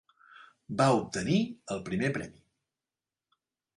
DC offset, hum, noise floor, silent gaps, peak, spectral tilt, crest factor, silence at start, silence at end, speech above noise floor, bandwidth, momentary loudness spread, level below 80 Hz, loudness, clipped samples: under 0.1%; none; under -90 dBFS; none; -12 dBFS; -6 dB/octave; 20 dB; 0.4 s; 1.45 s; over 61 dB; 11.5 kHz; 12 LU; -64 dBFS; -30 LUFS; under 0.1%